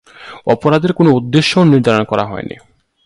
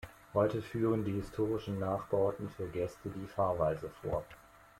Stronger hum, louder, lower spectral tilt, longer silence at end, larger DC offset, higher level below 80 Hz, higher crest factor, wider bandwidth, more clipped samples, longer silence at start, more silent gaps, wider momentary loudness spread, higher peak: neither; first, -13 LUFS vs -35 LUFS; second, -6.5 dB/octave vs -8 dB/octave; first, 0.55 s vs 0.4 s; neither; first, -48 dBFS vs -58 dBFS; about the same, 14 dB vs 18 dB; second, 11.5 kHz vs 16.5 kHz; neither; first, 0.2 s vs 0 s; neither; first, 13 LU vs 8 LU; first, 0 dBFS vs -18 dBFS